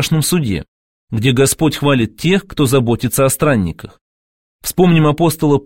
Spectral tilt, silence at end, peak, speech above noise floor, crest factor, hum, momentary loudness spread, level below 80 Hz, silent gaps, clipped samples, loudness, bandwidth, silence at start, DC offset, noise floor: -5.5 dB/octave; 0 s; 0 dBFS; over 76 dB; 14 dB; none; 10 LU; -40 dBFS; 0.68-1.08 s, 4.01-4.59 s; under 0.1%; -14 LUFS; 17 kHz; 0 s; 0.8%; under -90 dBFS